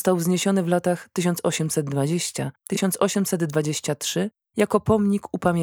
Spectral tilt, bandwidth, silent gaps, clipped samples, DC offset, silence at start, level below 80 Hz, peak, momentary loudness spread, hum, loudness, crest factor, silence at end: -5 dB/octave; 19.5 kHz; none; under 0.1%; under 0.1%; 0 s; -56 dBFS; -4 dBFS; 5 LU; none; -23 LUFS; 18 dB; 0 s